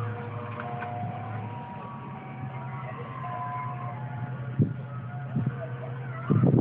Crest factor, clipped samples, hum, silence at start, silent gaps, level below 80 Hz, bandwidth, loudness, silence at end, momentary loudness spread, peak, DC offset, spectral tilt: 20 dB; under 0.1%; none; 0 s; none; -62 dBFS; 3.8 kHz; -33 LUFS; 0 s; 10 LU; -10 dBFS; under 0.1%; -12 dB/octave